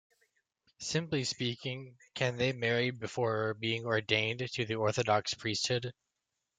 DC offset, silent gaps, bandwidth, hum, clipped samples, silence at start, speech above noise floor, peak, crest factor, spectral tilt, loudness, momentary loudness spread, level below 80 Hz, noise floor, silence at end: under 0.1%; none; 9.4 kHz; none; under 0.1%; 0.8 s; 53 dB; -10 dBFS; 24 dB; -4 dB/octave; -33 LUFS; 8 LU; -70 dBFS; -86 dBFS; 0.7 s